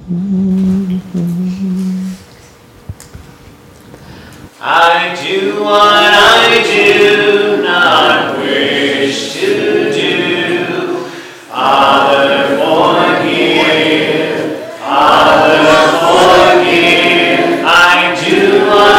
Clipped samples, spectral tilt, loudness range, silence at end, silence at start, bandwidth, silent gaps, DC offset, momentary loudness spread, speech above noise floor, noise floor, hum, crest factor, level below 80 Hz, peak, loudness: under 0.1%; -4 dB/octave; 10 LU; 0 s; 0 s; 16.5 kHz; none; under 0.1%; 11 LU; 28 dB; -39 dBFS; none; 10 dB; -44 dBFS; 0 dBFS; -9 LUFS